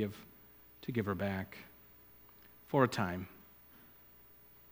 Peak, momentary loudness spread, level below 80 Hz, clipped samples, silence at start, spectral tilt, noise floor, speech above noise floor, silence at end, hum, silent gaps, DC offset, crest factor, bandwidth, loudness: -14 dBFS; 25 LU; -70 dBFS; under 0.1%; 0 s; -6.5 dB/octave; -60 dBFS; 25 dB; 1.3 s; 60 Hz at -65 dBFS; none; under 0.1%; 26 dB; over 20 kHz; -36 LUFS